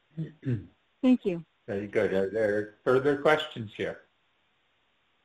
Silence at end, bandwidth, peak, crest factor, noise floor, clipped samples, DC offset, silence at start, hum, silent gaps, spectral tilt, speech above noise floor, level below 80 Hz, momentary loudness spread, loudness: 1.3 s; 11 kHz; -10 dBFS; 20 dB; -71 dBFS; under 0.1%; under 0.1%; 0.15 s; none; none; -7 dB/octave; 44 dB; -64 dBFS; 12 LU; -29 LUFS